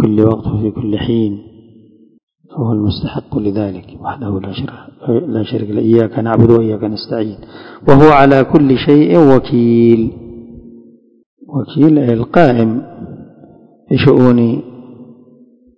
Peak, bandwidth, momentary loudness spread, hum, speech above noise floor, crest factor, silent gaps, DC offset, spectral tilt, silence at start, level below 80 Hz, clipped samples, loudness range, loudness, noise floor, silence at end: 0 dBFS; 6.6 kHz; 17 LU; none; 34 dB; 12 dB; 2.23-2.27 s, 11.26-11.37 s; under 0.1%; -9.5 dB/octave; 0 s; -38 dBFS; 1%; 10 LU; -12 LUFS; -45 dBFS; 0.75 s